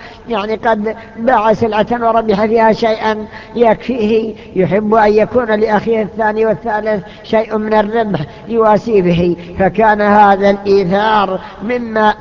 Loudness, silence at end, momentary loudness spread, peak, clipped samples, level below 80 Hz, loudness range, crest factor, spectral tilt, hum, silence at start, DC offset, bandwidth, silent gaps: -13 LUFS; 0 s; 9 LU; 0 dBFS; under 0.1%; -40 dBFS; 3 LU; 12 dB; -7.5 dB/octave; none; 0 s; under 0.1%; 7.2 kHz; none